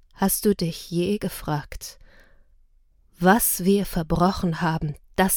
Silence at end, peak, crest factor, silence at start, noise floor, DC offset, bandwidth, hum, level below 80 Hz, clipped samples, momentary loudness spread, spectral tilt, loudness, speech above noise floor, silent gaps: 0 s; -2 dBFS; 22 dB; 0.2 s; -58 dBFS; under 0.1%; 19 kHz; none; -42 dBFS; under 0.1%; 11 LU; -5 dB/octave; -23 LUFS; 35 dB; none